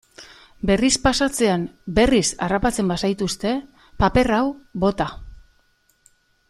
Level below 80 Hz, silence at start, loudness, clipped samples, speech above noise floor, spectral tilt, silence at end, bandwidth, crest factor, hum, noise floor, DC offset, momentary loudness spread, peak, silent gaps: -36 dBFS; 0.2 s; -20 LUFS; under 0.1%; 42 dB; -4.5 dB/octave; 1.15 s; 14.5 kHz; 18 dB; none; -62 dBFS; under 0.1%; 8 LU; -4 dBFS; none